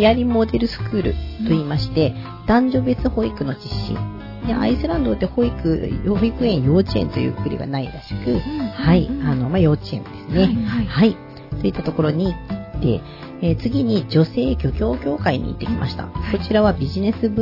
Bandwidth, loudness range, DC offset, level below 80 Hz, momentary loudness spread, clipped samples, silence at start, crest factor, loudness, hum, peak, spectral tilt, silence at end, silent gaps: 5.8 kHz; 2 LU; under 0.1%; -32 dBFS; 9 LU; under 0.1%; 0 s; 16 dB; -20 LUFS; none; -4 dBFS; -9 dB/octave; 0 s; none